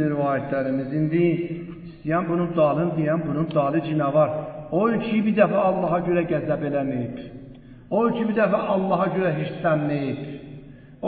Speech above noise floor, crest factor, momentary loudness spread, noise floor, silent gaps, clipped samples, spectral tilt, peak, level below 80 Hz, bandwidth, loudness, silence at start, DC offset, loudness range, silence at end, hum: 21 dB; 18 dB; 12 LU; -43 dBFS; none; under 0.1%; -12.5 dB/octave; -4 dBFS; -54 dBFS; 4.7 kHz; -23 LUFS; 0 s; under 0.1%; 2 LU; 0 s; none